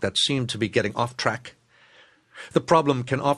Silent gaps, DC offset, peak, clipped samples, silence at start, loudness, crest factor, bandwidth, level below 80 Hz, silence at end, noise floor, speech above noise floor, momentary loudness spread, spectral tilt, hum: none; under 0.1%; -4 dBFS; under 0.1%; 0 s; -23 LUFS; 20 dB; 12 kHz; -60 dBFS; 0 s; -56 dBFS; 32 dB; 7 LU; -4.5 dB/octave; none